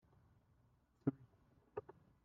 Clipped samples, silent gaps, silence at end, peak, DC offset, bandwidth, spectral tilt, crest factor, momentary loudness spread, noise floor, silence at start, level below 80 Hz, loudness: under 0.1%; none; 0.45 s; -24 dBFS; under 0.1%; 4.2 kHz; -10.5 dB/octave; 28 dB; 21 LU; -75 dBFS; 1.05 s; -80 dBFS; -47 LUFS